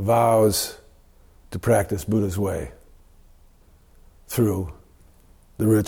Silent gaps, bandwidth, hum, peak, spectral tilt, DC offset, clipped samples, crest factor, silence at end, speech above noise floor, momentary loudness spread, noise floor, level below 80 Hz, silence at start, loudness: none; 19.5 kHz; none; -8 dBFS; -6 dB/octave; under 0.1%; under 0.1%; 16 dB; 0 s; 32 dB; 14 LU; -53 dBFS; -46 dBFS; 0 s; -22 LUFS